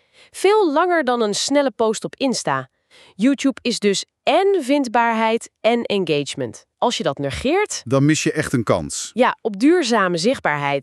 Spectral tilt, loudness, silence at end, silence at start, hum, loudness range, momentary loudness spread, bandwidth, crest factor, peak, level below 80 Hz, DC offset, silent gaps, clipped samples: -4.5 dB/octave; -19 LUFS; 0 s; 0.35 s; none; 2 LU; 6 LU; 13 kHz; 16 dB; -2 dBFS; -52 dBFS; under 0.1%; none; under 0.1%